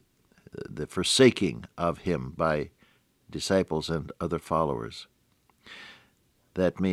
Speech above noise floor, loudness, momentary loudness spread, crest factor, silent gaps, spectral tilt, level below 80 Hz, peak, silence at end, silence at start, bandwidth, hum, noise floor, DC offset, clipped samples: 40 dB; -27 LUFS; 24 LU; 22 dB; none; -4.5 dB/octave; -54 dBFS; -6 dBFS; 0 s; 0.55 s; 15 kHz; none; -67 dBFS; under 0.1%; under 0.1%